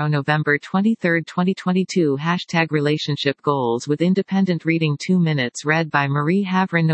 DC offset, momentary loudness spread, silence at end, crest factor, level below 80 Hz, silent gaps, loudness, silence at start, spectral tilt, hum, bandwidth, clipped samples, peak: under 0.1%; 3 LU; 0 s; 18 dB; -68 dBFS; none; -20 LUFS; 0 s; -6.5 dB/octave; none; 8.6 kHz; under 0.1%; -2 dBFS